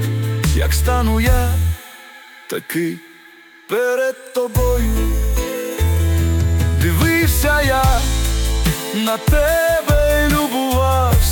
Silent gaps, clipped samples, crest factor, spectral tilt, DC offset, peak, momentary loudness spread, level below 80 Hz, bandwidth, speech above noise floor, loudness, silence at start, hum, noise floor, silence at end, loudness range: none; under 0.1%; 12 dB; -5 dB/octave; under 0.1%; -4 dBFS; 8 LU; -22 dBFS; 19.5 kHz; 28 dB; -17 LUFS; 0 s; none; -44 dBFS; 0 s; 5 LU